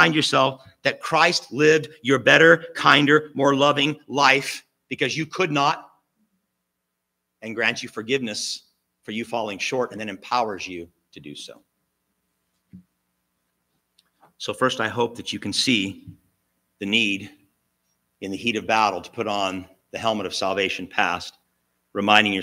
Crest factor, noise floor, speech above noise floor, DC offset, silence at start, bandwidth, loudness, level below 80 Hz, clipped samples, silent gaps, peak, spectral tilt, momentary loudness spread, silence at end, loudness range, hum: 24 dB; -79 dBFS; 57 dB; under 0.1%; 0 s; 16 kHz; -21 LUFS; -70 dBFS; under 0.1%; none; 0 dBFS; -3.5 dB/octave; 17 LU; 0 s; 12 LU; none